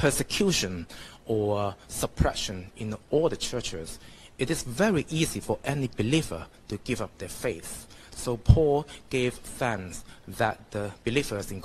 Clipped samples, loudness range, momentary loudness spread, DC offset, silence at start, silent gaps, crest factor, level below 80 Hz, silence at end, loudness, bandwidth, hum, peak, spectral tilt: under 0.1%; 2 LU; 14 LU; under 0.1%; 0 s; none; 26 dB; -40 dBFS; 0 s; -29 LUFS; 13 kHz; none; -2 dBFS; -5 dB/octave